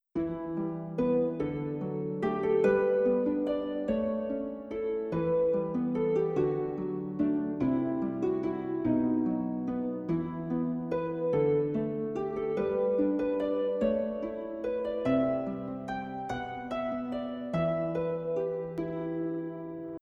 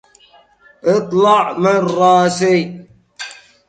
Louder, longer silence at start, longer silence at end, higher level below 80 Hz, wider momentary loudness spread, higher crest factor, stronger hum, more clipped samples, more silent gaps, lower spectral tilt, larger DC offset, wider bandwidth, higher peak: second, -31 LUFS vs -14 LUFS; second, 0.15 s vs 0.85 s; second, 0.05 s vs 0.35 s; about the same, -58 dBFS vs -62 dBFS; second, 8 LU vs 19 LU; about the same, 16 dB vs 16 dB; neither; neither; neither; first, -9.5 dB/octave vs -5.5 dB/octave; neither; second, 7.4 kHz vs 9.2 kHz; second, -14 dBFS vs 0 dBFS